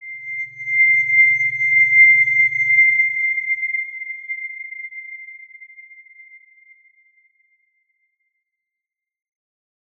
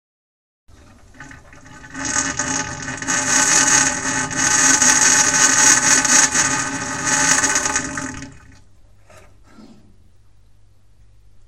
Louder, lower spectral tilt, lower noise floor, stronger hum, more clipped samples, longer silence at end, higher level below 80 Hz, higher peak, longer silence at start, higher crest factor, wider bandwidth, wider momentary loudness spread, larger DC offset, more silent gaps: about the same, -14 LUFS vs -14 LUFS; first, -2.5 dB/octave vs -0.5 dB/octave; first, -86 dBFS vs -53 dBFS; neither; neither; first, 4.2 s vs 1.8 s; second, -78 dBFS vs -46 dBFS; second, -4 dBFS vs 0 dBFS; second, 0 s vs 0.7 s; about the same, 16 dB vs 20 dB; second, 6.6 kHz vs 16.5 kHz; first, 21 LU vs 15 LU; second, under 0.1% vs 0.4%; neither